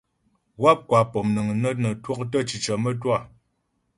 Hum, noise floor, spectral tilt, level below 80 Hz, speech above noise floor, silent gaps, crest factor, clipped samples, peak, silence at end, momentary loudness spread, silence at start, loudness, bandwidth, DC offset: none; -72 dBFS; -6 dB/octave; -58 dBFS; 50 dB; none; 22 dB; under 0.1%; -2 dBFS; 0.7 s; 7 LU; 0.6 s; -23 LUFS; 11.5 kHz; under 0.1%